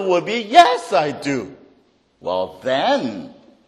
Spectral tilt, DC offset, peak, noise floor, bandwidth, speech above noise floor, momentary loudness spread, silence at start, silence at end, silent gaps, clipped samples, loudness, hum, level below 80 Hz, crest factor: -4 dB/octave; under 0.1%; 0 dBFS; -57 dBFS; 12.5 kHz; 40 dB; 17 LU; 0 s; 0.35 s; none; under 0.1%; -18 LUFS; none; -62 dBFS; 20 dB